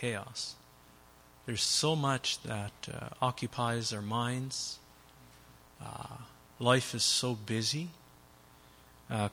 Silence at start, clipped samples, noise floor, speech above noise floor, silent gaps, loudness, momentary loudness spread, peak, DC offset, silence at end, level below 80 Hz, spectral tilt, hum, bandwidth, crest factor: 0 s; under 0.1%; -59 dBFS; 26 dB; none; -33 LUFS; 19 LU; -12 dBFS; under 0.1%; 0 s; -66 dBFS; -3.5 dB/octave; none; 16.5 kHz; 24 dB